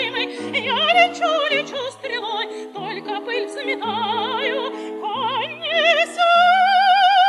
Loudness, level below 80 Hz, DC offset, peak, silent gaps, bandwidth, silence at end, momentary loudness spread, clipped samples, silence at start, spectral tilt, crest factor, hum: -19 LUFS; -84 dBFS; under 0.1%; -2 dBFS; none; 12 kHz; 0 s; 13 LU; under 0.1%; 0 s; -2.5 dB/octave; 18 dB; none